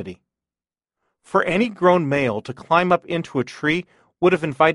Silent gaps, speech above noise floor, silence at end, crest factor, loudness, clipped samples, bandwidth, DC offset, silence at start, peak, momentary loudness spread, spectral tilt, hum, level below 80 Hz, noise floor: none; over 70 dB; 0 s; 18 dB; -20 LUFS; under 0.1%; 11.5 kHz; under 0.1%; 0 s; -2 dBFS; 8 LU; -6.5 dB/octave; none; -58 dBFS; under -90 dBFS